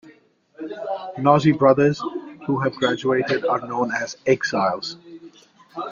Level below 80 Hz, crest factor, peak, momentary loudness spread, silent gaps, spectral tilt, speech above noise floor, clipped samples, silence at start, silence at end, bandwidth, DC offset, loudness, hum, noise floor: -62 dBFS; 20 dB; -2 dBFS; 16 LU; none; -6 dB/octave; 33 dB; under 0.1%; 0.05 s; 0 s; 7.4 kHz; under 0.1%; -21 LUFS; none; -54 dBFS